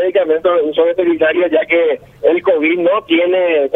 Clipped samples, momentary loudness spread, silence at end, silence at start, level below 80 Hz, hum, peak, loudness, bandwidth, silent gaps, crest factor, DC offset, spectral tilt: under 0.1%; 2 LU; 0 s; 0 s; -56 dBFS; none; 0 dBFS; -13 LUFS; 3.9 kHz; none; 12 dB; under 0.1%; -6.5 dB/octave